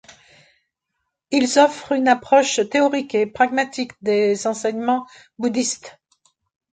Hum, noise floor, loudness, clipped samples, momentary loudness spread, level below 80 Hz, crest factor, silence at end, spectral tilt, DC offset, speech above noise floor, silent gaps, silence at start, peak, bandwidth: none; -77 dBFS; -19 LUFS; under 0.1%; 9 LU; -66 dBFS; 18 dB; 0.8 s; -3 dB/octave; under 0.1%; 58 dB; none; 1.3 s; -2 dBFS; 9.4 kHz